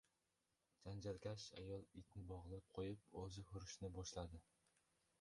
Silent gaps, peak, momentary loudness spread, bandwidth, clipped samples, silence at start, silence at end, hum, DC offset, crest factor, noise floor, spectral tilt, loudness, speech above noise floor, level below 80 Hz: none; -36 dBFS; 6 LU; 11.5 kHz; under 0.1%; 0.8 s; 0.8 s; none; under 0.1%; 18 dB; -89 dBFS; -5.5 dB/octave; -54 LUFS; 35 dB; -66 dBFS